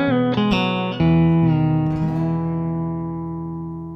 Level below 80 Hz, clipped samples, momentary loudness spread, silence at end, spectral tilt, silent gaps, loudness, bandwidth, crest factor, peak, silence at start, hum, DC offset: -42 dBFS; under 0.1%; 12 LU; 0 s; -9 dB/octave; none; -20 LUFS; 6 kHz; 14 dB; -6 dBFS; 0 s; none; under 0.1%